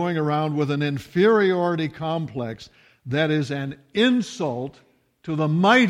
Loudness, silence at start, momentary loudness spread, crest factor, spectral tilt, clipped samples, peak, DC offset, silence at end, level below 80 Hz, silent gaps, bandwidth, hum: -23 LUFS; 0 s; 14 LU; 18 dB; -6.5 dB/octave; under 0.1%; -4 dBFS; under 0.1%; 0 s; -62 dBFS; none; 12 kHz; none